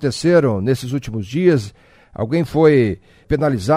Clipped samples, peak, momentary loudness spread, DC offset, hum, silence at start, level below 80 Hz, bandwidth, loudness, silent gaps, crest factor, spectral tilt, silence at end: under 0.1%; 0 dBFS; 11 LU; under 0.1%; none; 0 s; -42 dBFS; 15.5 kHz; -17 LUFS; none; 16 dB; -7 dB/octave; 0 s